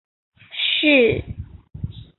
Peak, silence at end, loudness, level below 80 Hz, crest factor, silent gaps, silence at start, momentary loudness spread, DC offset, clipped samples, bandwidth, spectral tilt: -2 dBFS; 0.15 s; -17 LUFS; -42 dBFS; 18 dB; none; 0.5 s; 22 LU; under 0.1%; under 0.1%; 4.4 kHz; -9.5 dB/octave